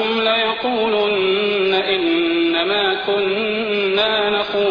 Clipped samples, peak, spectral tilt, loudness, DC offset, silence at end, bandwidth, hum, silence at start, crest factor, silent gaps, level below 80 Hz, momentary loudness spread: under 0.1%; -6 dBFS; -6 dB/octave; -17 LUFS; under 0.1%; 0 s; 5.2 kHz; none; 0 s; 12 dB; none; -54 dBFS; 3 LU